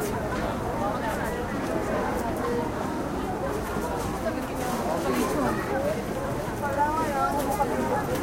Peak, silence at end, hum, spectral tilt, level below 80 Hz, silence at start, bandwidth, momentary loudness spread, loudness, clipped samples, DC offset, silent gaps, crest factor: -12 dBFS; 0 s; none; -5.5 dB/octave; -42 dBFS; 0 s; 16 kHz; 4 LU; -28 LUFS; under 0.1%; under 0.1%; none; 16 dB